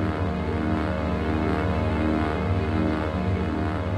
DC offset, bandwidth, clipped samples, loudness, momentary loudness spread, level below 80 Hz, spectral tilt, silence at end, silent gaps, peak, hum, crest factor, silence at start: under 0.1%; 9.4 kHz; under 0.1%; -25 LUFS; 2 LU; -34 dBFS; -8.5 dB/octave; 0 s; none; -10 dBFS; none; 14 dB; 0 s